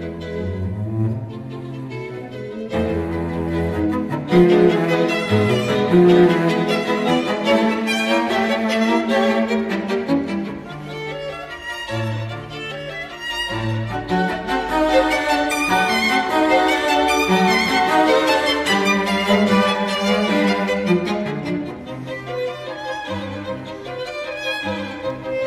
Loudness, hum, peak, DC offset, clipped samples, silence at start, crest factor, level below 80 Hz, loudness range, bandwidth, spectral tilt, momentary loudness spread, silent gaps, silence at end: -19 LUFS; none; -4 dBFS; under 0.1%; under 0.1%; 0 s; 16 dB; -44 dBFS; 10 LU; 14 kHz; -5.5 dB/octave; 14 LU; none; 0 s